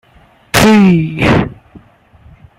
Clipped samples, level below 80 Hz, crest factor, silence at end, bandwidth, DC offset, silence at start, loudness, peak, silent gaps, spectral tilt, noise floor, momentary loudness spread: under 0.1%; -34 dBFS; 12 dB; 0.8 s; 16.5 kHz; under 0.1%; 0.55 s; -10 LUFS; 0 dBFS; none; -5.5 dB/octave; -46 dBFS; 8 LU